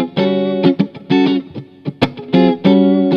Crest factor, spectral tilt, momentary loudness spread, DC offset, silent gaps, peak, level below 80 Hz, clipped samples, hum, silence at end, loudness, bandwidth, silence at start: 14 dB; -8.5 dB/octave; 11 LU; under 0.1%; none; 0 dBFS; -48 dBFS; under 0.1%; none; 0 s; -14 LUFS; 6.6 kHz; 0 s